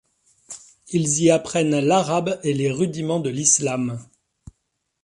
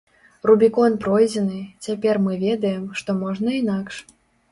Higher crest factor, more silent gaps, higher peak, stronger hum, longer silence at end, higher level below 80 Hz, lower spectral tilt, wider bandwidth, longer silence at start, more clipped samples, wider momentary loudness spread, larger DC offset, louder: about the same, 20 dB vs 18 dB; neither; about the same, -2 dBFS vs -4 dBFS; neither; first, 1 s vs 0.5 s; about the same, -58 dBFS vs -60 dBFS; second, -4.5 dB/octave vs -6.5 dB/octave; about the same, 11.5 kHz vs 11.5 kHz; about the same, 0.5 s vs 0.45 s; neither; first, 20 LU vs 12 LU; neither; about the same, -20 LUFS vs -20 LUFS